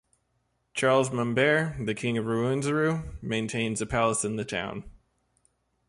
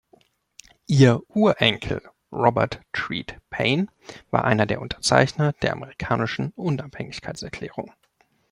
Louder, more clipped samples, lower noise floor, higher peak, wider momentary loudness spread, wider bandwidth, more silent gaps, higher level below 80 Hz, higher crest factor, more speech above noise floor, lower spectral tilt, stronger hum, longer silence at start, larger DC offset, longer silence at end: second, -27 LUFS vs -23 LUFS; neither; first, -74 dBFS vs -65 dBFS; second, -10 dBFS vs -2 dBFS; second, 9 LU vs 15 LU; about the same, 11.5 kHz vs 11.5 kHz; neither; about the same, -52 dBFS vs -50 dBFS; about the same, 18 dB vs 22 dB; first, 47 dB vs 42 dB; about the same, -5 dB/octave vs -5.5 dB/octave; neither; second, 0.75 s vs 0.9 s; neither; first, 1 s vs 0.65 s